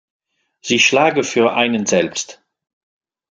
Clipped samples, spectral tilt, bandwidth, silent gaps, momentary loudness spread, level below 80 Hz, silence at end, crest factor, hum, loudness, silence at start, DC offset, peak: under 0.1%; -3 dB/octave; 10 kHz; none; 14 LU; -62 dBFS; 0.95 s; 18 dB; none; -15 LUFS; 0.65 s; under 0.1%; -2 dBFS